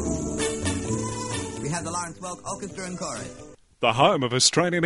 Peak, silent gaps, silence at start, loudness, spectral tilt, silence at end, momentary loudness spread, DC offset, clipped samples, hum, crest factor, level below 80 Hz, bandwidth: -4 dBFS; none; 0 s; -25 LUFS; -3.5 dB/octave; 0 s; 14 LU; under 0.1%; under 0.1%; none; 22 dB; -46 dBFS; 11.5 kHz